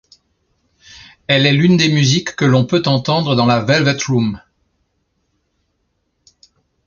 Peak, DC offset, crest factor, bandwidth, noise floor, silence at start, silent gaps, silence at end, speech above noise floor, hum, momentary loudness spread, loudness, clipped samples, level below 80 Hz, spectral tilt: 0 dBFS; under 0.1%; 16 dB; 7.2 kHz; -67 dBFS; 1.3 s; none; 2.5 s; 54 dB; none; 6 LU; -14 LUFS; under 0.1%; -50 dBFS; -5.5 dB/octave